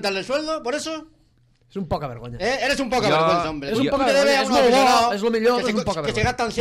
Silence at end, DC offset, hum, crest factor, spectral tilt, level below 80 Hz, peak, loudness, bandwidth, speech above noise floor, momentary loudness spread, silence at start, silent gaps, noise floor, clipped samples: 0 s; under 0.1%; none; 12 dB; -4 dB/octave; -46 dBFS; -8 dBFS; -20 LUFS; 16 kHz; 39 dB; 12 LU; 0 s; none; -59 dBFS; under 0.1%